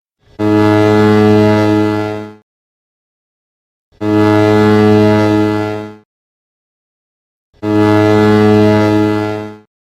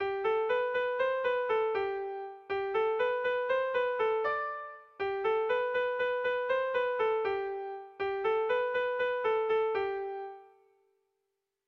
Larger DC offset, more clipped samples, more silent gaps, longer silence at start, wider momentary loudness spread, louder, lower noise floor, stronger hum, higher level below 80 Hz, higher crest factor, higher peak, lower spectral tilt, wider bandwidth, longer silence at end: neither; neither; first, 2.42-3.92 s, 6.05-7.53 s vs none; first, 0.4 s vs 0 s; first, 13 LU vs 8 LU; first, -11 LUFS vs -31 LUFS; first, under -90 dBFS vs -84 dBFS; neither; first, -44 dBFS vs -70 dBFS; about the same, 12 dB vs 12 dB; first, 0 dBFS vs -20 dBFS; first, -7.5 dB/octave vs -5 dB/octave; first, 14 kHz vs 6 kHz; second, 0.35 s vs 1.2 s